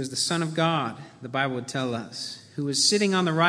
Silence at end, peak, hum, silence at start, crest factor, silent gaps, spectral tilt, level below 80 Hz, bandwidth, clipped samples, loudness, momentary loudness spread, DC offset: 0 s; -6 dBFS; none; 0 s; 20 dB; none; -3.5 dB/octave; -70 dBFS; 11 kHz; under 0.1%; -25 LUFS; 14 LU; under 0.1%